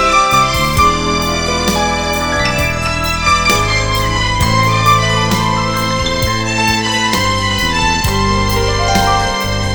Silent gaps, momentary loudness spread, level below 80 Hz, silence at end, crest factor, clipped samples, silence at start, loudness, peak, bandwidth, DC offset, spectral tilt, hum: none; 4 LU; -24 dBFS; 0 s; 14 dB; under 0.1%; 0 s; -13 LUFS; 0 dBFS; over 20 kHz; 0.8%; -3.5 dB/octave; none